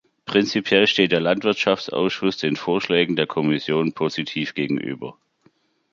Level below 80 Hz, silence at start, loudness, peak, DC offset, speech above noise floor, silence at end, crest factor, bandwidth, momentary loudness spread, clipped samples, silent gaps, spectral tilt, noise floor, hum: -62 dBFS; 0.25 s; -21 LUFS; -2 dBFS; under 0.1%; 40 dB; 0.8 s; 20 dB; 7.4 kHz; 8 LU; under 0.1%; none; -5.5 dB/octave; -61 dBFS; none